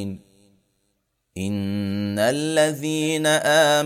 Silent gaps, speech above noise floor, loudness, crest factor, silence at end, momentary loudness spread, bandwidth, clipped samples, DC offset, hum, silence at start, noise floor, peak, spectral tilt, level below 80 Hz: none; 52 dB; -21 LUFS; 18 dB; 0 s; 15 LU; 16 kHz; under 0.1%; under 0.1%; none; 0 s; -72 dBFS; -6 dBFS; -4 dB/octave; -64 dBFS